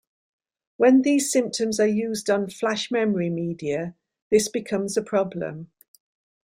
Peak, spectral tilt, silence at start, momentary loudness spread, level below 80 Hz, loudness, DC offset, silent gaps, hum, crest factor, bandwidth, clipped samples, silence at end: -6 dBFS; -4.5 dB/octave; 0.8 s; 11 LU; -64 dBFS; -23 LUFS; under 0.1%; 4.22-4.31 s; none; 18 dB; 16 kHz; under 0.1%; 0.8 s